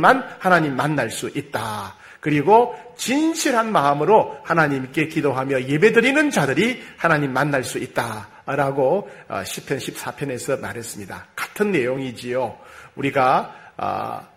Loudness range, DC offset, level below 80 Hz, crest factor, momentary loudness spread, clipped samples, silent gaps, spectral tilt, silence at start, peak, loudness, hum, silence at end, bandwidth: 7 LU; under 0.1%; -58 dBFS; 20 dB; 14 LU; under 0.1%; none; -5 dB/octave; 0 s; 0 dBFS; -20 LUFS; none; 0.1 s; 16 kHz